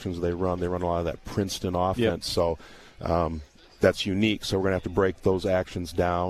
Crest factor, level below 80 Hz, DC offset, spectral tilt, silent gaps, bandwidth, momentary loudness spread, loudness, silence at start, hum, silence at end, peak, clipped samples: 20 dB; -44 dBFS; under 0.1%; -5.5 dB/octave; none; 14 kHz; 6 LU; -27 LUFS; 0 s; none; 0 s; -6 dBFS; under 0.1%